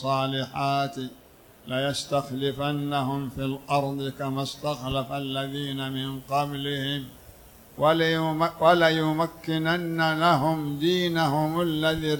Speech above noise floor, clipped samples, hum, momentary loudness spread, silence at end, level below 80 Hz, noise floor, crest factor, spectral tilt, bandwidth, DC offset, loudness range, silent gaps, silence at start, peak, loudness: 24 dB; under 0.1%; none; 9 LU; 0 s; -54 dBFS; -50 dBFS; 20 dB; -5.5 dB/octave; 19.5 kHz; under 0.1%; 6 LU; none; 0 s; -6 dBFS; -26 LUFS